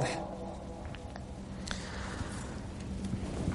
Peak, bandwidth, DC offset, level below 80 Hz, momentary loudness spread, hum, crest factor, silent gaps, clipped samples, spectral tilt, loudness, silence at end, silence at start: -16 dBFS; 11.5 kHz; under 0.1%; -46 dBFS; 7 LU; none; 24 dB; none; under 0.1%; -5.5 dB/octave; -40 LUFS; 0 s; 0 s